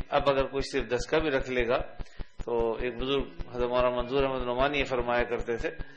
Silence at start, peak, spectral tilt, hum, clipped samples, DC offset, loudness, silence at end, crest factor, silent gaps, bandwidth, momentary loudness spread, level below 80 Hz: 0 s; -8 dBFS; -5.5 dB/octave; none; under 0.1%; under 0.1%; -29 LUFS; 0 s; 20 dB; none; 9.8 kHz; 7 LU; -40 dBFS